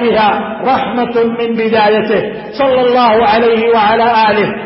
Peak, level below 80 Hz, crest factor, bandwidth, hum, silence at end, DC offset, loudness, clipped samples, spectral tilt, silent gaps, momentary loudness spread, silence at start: 0 dBFS; -46 dBFS; 10 dB; 5.8 kHz; none; 0 s; under 0.1%; -11 LUFS; under 0.1%; -10 dB/octave; none; 6 LU; 0 s